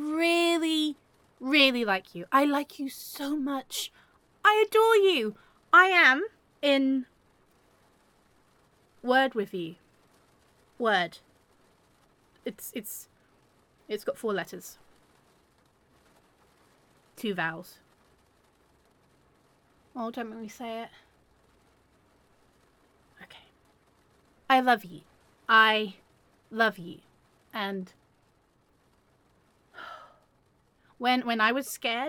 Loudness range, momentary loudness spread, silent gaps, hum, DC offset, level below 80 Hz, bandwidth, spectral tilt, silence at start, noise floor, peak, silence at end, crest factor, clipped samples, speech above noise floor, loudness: 19 LU; 21 LU; none; none; under 0.1%; -74 dBFS; 17.5 kHz; -3 dB/octave; 0 s; -67 dBFS; -6 dBFS; 0 s; 24 dB; under 0.1%; 41 dB; -26 LUFS